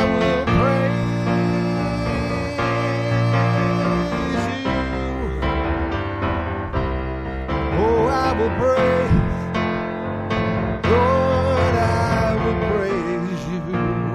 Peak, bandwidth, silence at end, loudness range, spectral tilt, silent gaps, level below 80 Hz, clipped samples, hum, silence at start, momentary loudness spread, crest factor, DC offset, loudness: -4 dBFS; 11 kHz; 0 s; 3 LU; -7.5 dB/octave; none; -32 dBFS; under 0.1%; none; 0 s; 7 LU; 16 dB; under 0.1%; -21 LUFS